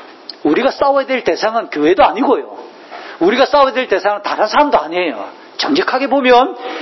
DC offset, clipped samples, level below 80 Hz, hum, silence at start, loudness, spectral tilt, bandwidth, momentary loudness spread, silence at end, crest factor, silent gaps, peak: under 0.1%; under 0.1%; -50 dBFS; none; 0 s; -14 LUFS; -4 dB/octave; 6.2 kHz; 17 LU; 0 s; 14 dB; none; 0 dBFS